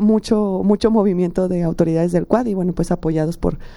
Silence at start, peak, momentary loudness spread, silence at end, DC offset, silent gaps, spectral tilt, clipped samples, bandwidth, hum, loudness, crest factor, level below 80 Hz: 0 s; -2 dBFS; 5 LU; 0 s; under 0.1%; none; -8 dB/octave; under 0.1%; 12 kHz; none; -18 LUFS; 16 dB; -34 dBFS